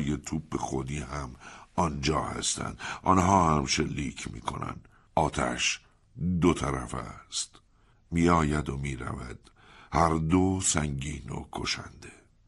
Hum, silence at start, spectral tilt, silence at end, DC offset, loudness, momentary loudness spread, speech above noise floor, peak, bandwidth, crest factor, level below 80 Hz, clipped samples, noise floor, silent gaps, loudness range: none; 0 s; -4.5 dB/octave; 0.35 s; under 0.1%; -29 LUFS; 14 LU; 32 dB; -8 dBFS; 11.5 kHz; 22 dB; -44 dBFS; under 0.1%; -60 dBFS; none; 3 LU